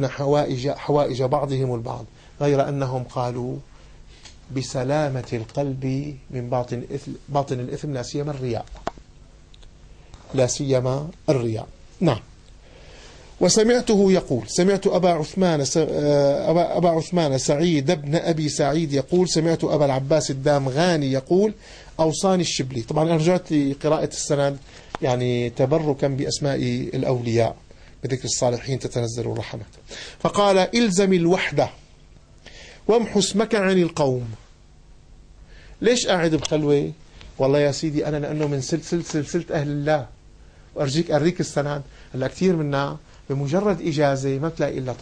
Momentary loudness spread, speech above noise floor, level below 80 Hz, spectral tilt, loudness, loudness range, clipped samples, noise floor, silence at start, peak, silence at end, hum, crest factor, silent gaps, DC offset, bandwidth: 11 LU; 27 dB; -48 dBFS; -5.5 dB/octave; -22 LUFS; 7 LU; under 0.1%; -48 dBFS; 0 s; -6 dBFS; 0 s; none; 16 dB; none; under 0.1%; 10.5 kHz